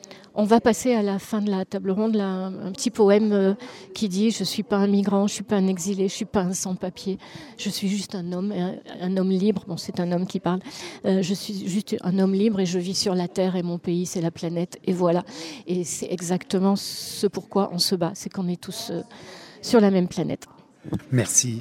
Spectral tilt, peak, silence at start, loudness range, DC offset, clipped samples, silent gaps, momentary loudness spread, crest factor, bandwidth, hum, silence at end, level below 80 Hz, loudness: -5 dB/octave; -4 dBFS; 0.05 s; 4 LU; under 0.1%; under 0.1%; none; 12 LU; 20 dB; 16 kHz; none; 0 s; -60 dBFS; -24 LUFS